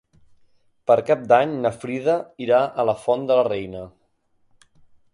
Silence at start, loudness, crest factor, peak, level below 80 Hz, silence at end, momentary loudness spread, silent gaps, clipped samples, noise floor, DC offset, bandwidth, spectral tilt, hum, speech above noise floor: 0.9 s; -21 LUFS; 20 dB; -4 dBFS; -60 dBFS; 1.25 s; 13 LU; none; under 0.1%; -64 dBFS; under 0.1%; 11 kHz; -6.5 dB/octave; none; 44 dB